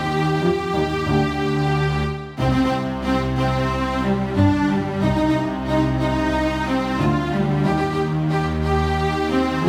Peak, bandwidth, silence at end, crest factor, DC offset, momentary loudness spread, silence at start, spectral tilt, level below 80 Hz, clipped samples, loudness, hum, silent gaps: -6 dBFS; 14 kHz; 0 s; 14 dB; under 0.1%; 3 LU; 0 s; -7 dB/octave; -32 dBFS; under 0.1%; -20 LUFS; none; none